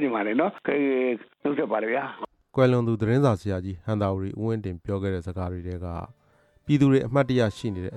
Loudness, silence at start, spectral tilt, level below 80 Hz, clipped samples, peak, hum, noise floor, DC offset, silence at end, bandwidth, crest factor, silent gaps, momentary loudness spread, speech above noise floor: -25 LUFS; 0 s; -8 dB/octave; -52 dBFS; under 0.1%; -8 dBFS; none; -57 dBFS; under 0.1%; 0 s; 11 kHz; 16 dB; none; 12 LU; 32 dB